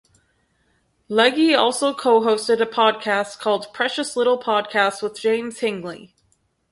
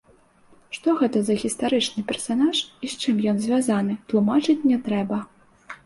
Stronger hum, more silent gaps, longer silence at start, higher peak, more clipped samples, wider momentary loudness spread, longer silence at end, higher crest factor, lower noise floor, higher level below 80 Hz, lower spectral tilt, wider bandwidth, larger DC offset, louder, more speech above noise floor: neither; neither; first, 1.1 s vs 0.7 s; first, -2 dBFS vs -10 dBFS; neither; about the same, 9 LU vs 8 LU; first, 0.65 s vs 0.1 s; first, 20 dB vs 14 dB; first, -66 dBFS vs -56 dBFS; second, -68 dBFS vs -62 dBFS; second, -3 dB/octave vs -5 dB/octave; about the same, 11.5 kHz vs 11.5 kHz; neither; first, -20 LUFS vs -23 LUFS; first, 46 dB vs 34 dB